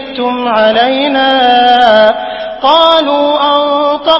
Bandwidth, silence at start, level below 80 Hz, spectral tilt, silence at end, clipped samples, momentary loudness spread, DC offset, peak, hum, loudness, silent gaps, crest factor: 8 kHz; 0 s; -48 dBFS; -4.5 dB/octave; 0 s; 0.4%; 8 LU; under 0.1%; 0 dBFS; none; -8 LUFS; none; 8 dB